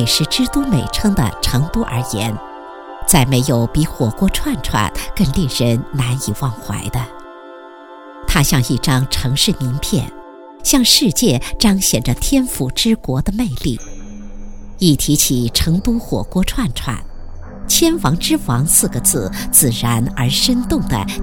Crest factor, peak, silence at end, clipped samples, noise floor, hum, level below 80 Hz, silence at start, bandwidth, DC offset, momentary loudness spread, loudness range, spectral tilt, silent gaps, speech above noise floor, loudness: 16 dB; 0 dBFS; 0 s; under 0.1%; -36 dBFS; none; -28 dBFS; 0 s; 19.5 kHz; under 0.1%; 16 LU; 5 LU; -4 dB/octave; none; 21 dB; -15 LUFS